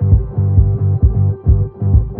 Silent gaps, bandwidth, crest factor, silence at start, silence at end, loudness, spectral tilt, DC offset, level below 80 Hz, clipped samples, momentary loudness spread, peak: none; 1.6 kHz; 12 dB; 0 s; 0 s; -15 LUFS; -16 dB/octave; under 0.1%; -18 dBFS; under 0.1%; 2 LU; 0 dBFS